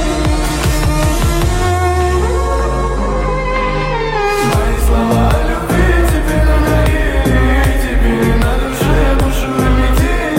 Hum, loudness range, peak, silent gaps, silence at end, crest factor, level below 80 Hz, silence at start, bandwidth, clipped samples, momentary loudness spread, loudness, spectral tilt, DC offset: none; 2 LU; -2 dBFS; none; 0 s; 10 dB; -14 dBFS; 0 s; 16.5 kHz; under 0.1%; 4 LU; -14 LUFS; -6 dB/octave; under 0.1%